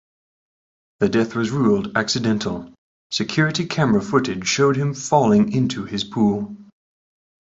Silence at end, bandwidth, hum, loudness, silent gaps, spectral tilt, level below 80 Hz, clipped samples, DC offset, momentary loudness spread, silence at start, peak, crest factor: 0.8 s; 8 kHz; none; -20 LUFS; 2.78-3.10 s; -5 dB/octave; -54 dBFS; under 0.1%; under 0.1%; 9 LU; 1 s; -2 dBFS; 18 dB